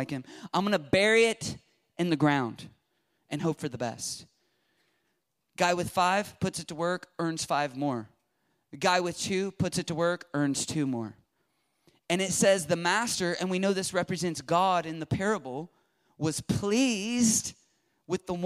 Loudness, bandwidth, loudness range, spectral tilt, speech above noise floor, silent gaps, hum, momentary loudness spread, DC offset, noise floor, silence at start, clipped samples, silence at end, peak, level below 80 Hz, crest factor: -28 LUFS; 15.5 kHz; 5 LU; -4 dB/octave; 50 dB; none; none; 12 LU; under 0.1%; -78 dBFS; 0 s; under 0.1%; 0 s; -12 dBFS; -62 dBFS; 18 dB